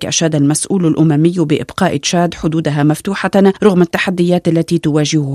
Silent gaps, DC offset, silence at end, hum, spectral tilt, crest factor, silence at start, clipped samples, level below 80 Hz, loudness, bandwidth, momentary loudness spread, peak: none; under 0.1%; 0 s; none; -5.5 dB/octave; 12 dB; 0 s; under 0.1%; -46 dBFS; -13 LUFS; 14 kHz; 4 LU; 0 dBFS